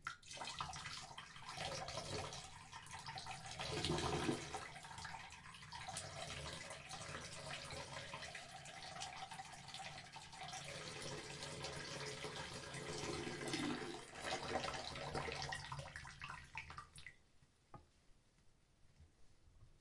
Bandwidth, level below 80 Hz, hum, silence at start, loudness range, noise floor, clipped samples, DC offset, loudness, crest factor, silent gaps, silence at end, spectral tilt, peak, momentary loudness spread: 11.5 kHz; -66 dBFS; none; 0 s; 5 LU; -71 dBFS; under 0.1%; under 0.1%; -48 LUFS; 24 dB; none; 0 s; -3.5 dB/octave; -24 dBFS; 10 LU